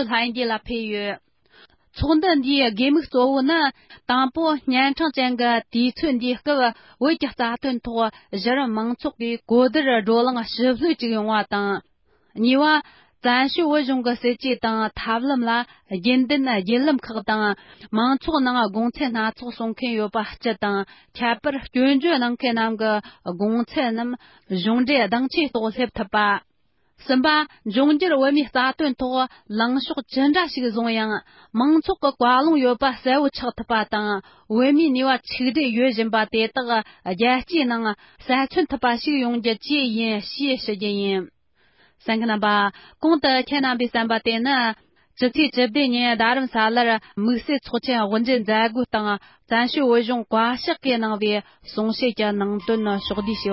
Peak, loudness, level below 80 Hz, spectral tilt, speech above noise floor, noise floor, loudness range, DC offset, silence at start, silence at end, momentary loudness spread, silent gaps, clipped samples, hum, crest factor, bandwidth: -6 dBFS; -21 LUFS; -52 dBFS; -9 dB/octave; 48 dB; -69 dBFS; 3 LU; under 0.1%; 0 s; 0 s; 8 LU; none; under 0.1%; none; 16 dB; 5.8 kHz